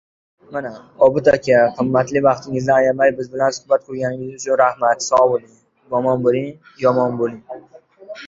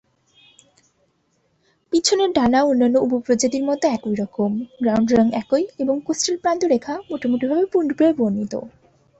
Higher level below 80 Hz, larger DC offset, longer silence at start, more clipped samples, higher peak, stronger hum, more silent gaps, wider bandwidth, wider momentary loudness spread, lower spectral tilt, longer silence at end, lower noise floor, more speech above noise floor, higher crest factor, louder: about the same, -56 dBFS vs -54 dBFS; neither; second, 0.5 s vs 1.9 s; neither; about the same, -2 dBFS vs -4 dBFS; neither; neither; about the same, 7.8 kHz vs 8.4 kHz; first, 14 LU vs 7 LU; about the same, -5.5 dB/octave vs -4.5 dB/octave; second, 0 s vs 0.5 s; second, -37 dBFS vs -66 dBFS; second, 20 dB vs 47 dB; about the same, 16 dB vs 18 dB; first, -17 LUFS vs -20 LUFS